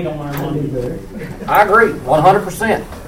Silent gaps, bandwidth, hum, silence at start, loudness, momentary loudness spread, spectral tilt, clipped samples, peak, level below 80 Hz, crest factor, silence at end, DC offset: none; 17 kHz; none; 0 s; -14 LUFS; 15 LU; -6 dB/octave; under 0.1%; 0 dBFS; -36 dBFS; 16 dB; 0 s; under 0.1%